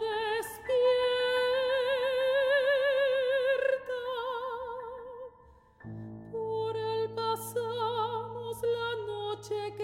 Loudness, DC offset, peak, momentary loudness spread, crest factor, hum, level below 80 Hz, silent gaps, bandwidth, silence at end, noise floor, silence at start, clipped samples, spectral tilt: -30 LUFS; under 0.1%; -18 dBFS; 15 LU; 14 dB; none; -66 dBFS; none; 16 kHz; 0 s; -58 dBFS; 0 s; under 0.1%; -3.5 dB/octave